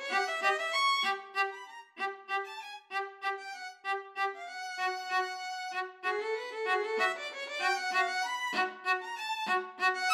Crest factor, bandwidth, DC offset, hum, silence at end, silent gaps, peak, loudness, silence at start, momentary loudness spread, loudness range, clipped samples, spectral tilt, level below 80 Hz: 18 dB; 16 kHz; under 0.1%; none; 0 s; none; -16 dBFS; -33 LUFS; 0 s; 9 LU; 5 LU; under 0.1%; 0 dB/octave; under -90 dBFS